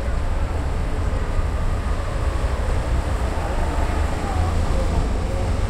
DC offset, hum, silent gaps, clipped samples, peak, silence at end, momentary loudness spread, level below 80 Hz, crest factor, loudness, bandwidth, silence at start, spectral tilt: under 0.1%; none; none; under 0.1%; -8 dBFS; 0 s; 3 LU; -22 dBFS; 14 dB; -24 LUFS; 12.5 kHz; 0 s; -6.5 dB/octave